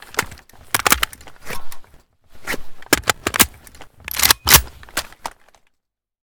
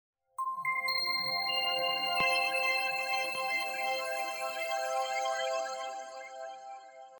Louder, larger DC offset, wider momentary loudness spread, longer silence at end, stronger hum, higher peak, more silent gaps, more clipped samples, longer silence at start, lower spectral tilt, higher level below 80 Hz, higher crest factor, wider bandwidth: first, -17 LUFS vs -31 LUFS; neither; first, 23 LU vs 16 LU; first, 0.95 s vs 0 s; neither; first, 0 dBFS vs -18 dBFS; neither; neither; second, 0.1 s vs 0.4 s; about the same, -1 dB/octave vs -0.5 dB/octave; first, -38 dBFS vs -80 dBFS; first, 22 dB vs 16 dB; about the same, over 20 kHz vs over 20 kHz